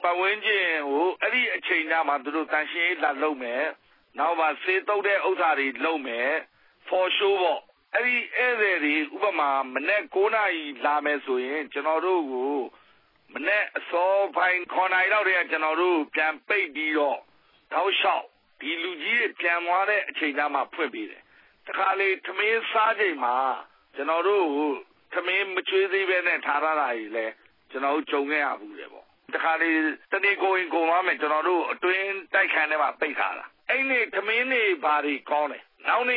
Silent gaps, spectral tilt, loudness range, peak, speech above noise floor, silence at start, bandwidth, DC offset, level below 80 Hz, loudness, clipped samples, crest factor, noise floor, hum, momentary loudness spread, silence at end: none; -5.5 dB/octave; 3 LU; -10 dBFS; 35 dB; 0 s; 5.2 kHz; under 0.1%; -82 dBFS; -24 LUFS; under 0.1%; 16 dB; -60 dBFS; none; 8 LU; 0 s